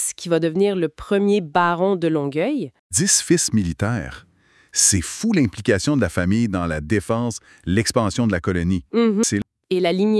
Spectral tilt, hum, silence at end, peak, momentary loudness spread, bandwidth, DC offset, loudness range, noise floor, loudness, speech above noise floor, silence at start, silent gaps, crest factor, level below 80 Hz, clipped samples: -4.5 dB/octave; none; 0 s; -2 dBFS; 8 LU; 12 kHz; under 0.1%; 2 LU; -46 dBFS; -20 LUFS; 27 dB; 0 s; 2.79-2.90 s; 18 dB; -48 dBFS; under 0.1%